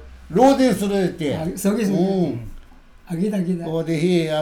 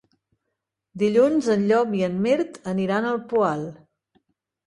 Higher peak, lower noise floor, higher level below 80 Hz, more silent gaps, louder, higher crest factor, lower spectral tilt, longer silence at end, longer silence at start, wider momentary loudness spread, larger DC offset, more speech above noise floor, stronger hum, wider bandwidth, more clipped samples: first, -2 dBFS vs -8 dBFS; second, -44 dBFS vs -81 dBFS; first, -44 dBFS vs -64 dBFS; neither; about the same, -20 LUFS vs -22 LUFS; about the same, 18 dB vs 16 dB; about the same, -6.5 dB/octave vs -7 dB/octave; second, 0 s vs 0.9 s; second, 0 s vs 0.95 s; about the same, 10 LU vs 8 LU; neither; second, 25 dB vs 59 dB; neither; first, 17.5 kHz vs 11 kHz; neither